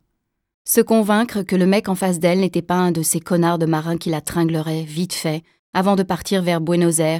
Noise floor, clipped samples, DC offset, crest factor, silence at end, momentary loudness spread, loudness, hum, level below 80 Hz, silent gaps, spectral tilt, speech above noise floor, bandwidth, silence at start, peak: -73 dBFS; under 0.1%; under 0.1%; 18 dB; 0 s; 8 LU; -19 LUFS; none; -54 dBFS; 5.59-5.73 s; -5 dB/octave; 55 dB; 17.5 kHz; 0.65 s; 0 dBFS